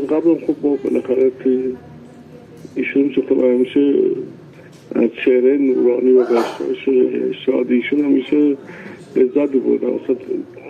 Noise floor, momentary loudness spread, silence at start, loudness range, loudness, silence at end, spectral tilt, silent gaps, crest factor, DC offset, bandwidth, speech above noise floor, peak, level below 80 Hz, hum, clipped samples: -40 dBFS; 11 LU; 0 s; 3 LU; -17 LUFS; 0 s; -7 dB/octave; none; 14 dB; under 0.1%; 7.2 kHz; 24 dB; -4 dBFS; -62 dBFS; none; under 0.1%